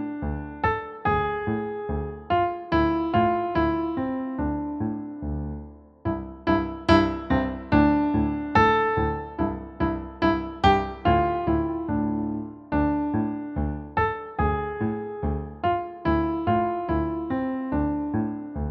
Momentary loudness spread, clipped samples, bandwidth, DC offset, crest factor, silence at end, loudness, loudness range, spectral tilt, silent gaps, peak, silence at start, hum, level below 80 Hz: 10 LU; under 0.1%; 7.2 kHz; under 0.1%; 20 dB; 0 s; -25 LUFS; 5 LU; -8.5 dB/octave; none; -6 dBFS; 0 s; none; -38 dBFS